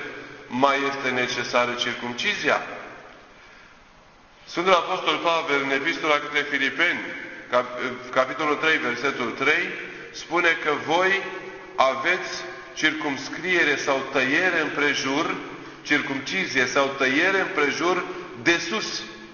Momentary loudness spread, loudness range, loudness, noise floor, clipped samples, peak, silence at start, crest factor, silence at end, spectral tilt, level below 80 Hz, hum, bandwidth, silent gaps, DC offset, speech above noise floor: 12 LU; 3 LU; -23 LUFS; -52 dBFS; under 0.1%; -2 dBFS; 0 s; 22 dB; 0 s; -3 dB/octave; -62 dBFS; none; 7.2 kHz; none; under 0.1%; 28 dB